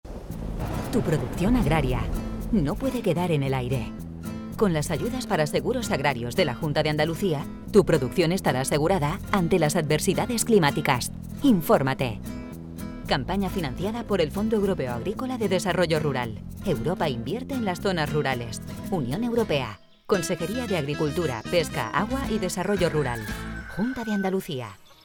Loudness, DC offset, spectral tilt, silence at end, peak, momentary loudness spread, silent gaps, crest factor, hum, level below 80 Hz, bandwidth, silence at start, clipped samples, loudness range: -25 LUFS; under 0.1%; -5.5 dB/octave; 0.1 s; -6 dBFS; 11 LU; none; 20 dB; none; -40 dBFS; 19.5 kHz; 0.05 s; under 0.1%; 4 LU